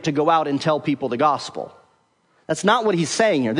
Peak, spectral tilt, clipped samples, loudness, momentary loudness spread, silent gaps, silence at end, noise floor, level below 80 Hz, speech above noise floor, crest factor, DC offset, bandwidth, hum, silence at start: -4 dBFS; -4.5 dB/octave; under 0.1%; -20 LUFS; 11 LU; none; 0 s; -62 dBFS; -68 dBFS; 42 dB; 18 dB; under 0.1%; 11 kHz; none; 0 s